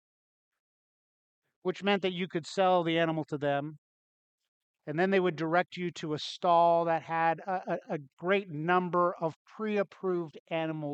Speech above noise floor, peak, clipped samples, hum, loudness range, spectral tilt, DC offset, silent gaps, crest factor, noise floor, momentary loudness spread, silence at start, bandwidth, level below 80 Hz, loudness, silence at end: over 60 dB; -12 dBFS; under 0.1%; none; 3 LU; -6 dB/octave; under 0.1%; 3.78-4.39 s, 4.48-4.74 s, 8.13-8.17 s, 9.36-9.45 s, 10.40-10.46 s; 20 dB; under -90 dBFS; 10 LU; 1.65 s; 8.8 kHz; -82 dBFS; -30 LUFS; 0 s